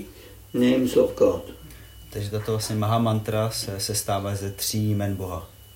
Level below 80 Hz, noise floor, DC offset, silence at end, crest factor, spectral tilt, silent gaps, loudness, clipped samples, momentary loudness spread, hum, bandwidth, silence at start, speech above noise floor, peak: -50 dBFS; -45 dBFS; under 0.1%; 0.15 s; 20 dB; -5.5 dB/octave; none; -25 LUFS; under 0.1%; 17 LU; none; 16.5 kHz; 0 s; 21 dB; -6 dBFS